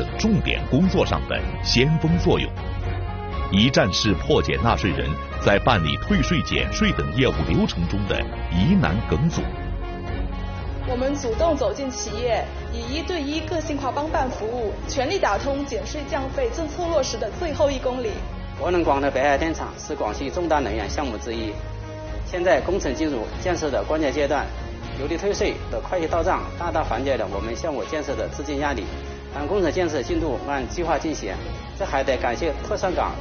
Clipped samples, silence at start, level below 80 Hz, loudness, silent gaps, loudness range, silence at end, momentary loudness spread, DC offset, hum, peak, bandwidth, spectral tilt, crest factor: under 0.1%; 0 s; -32 dBFS; -23 LUFS; none; 5 LU; 0 s; 10 LU; under 0.1%; none; -2 dBFS; 6.8 kHz; -4.5 dB/octave; 22 dB